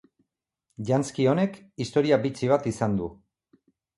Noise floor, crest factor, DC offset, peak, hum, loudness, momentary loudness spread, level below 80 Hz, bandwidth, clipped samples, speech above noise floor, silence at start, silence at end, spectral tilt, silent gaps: -79 dBFS; 20 dB; under 0.1%; -8 dBFS; none; -25 LUFS; 10 LU; -58 dBFS; 11.5 kHz; under 0.1%; 54 dB; 0.8 s; 0.85 s; -6.5 dB/octave; none